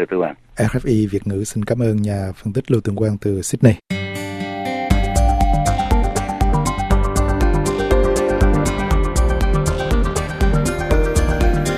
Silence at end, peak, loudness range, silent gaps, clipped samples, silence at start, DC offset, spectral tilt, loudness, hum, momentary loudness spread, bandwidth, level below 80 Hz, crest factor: 0 s; 0 dBFS; 2 LU; none; under 0.1%; 0 s; under 0.1%; -6 dB/octave; -19 LUFS; none; 7 LU; 14.5 kHz; -20 dBFS; 16 dB